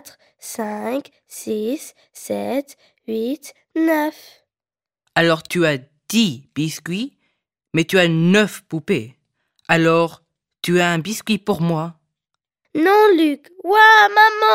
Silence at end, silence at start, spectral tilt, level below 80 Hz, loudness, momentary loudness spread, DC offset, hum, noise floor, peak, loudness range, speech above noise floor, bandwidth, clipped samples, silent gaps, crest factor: 0 s; 0.05 s; -5 dB/octave; -64 dBFS; -18 LUFS; 16 LU; under 0.1%; none; under -90 dBFS; 0 dBFS; 8 LU; over 73 dB; 16 kHz; under 0.1%; none; 18 dB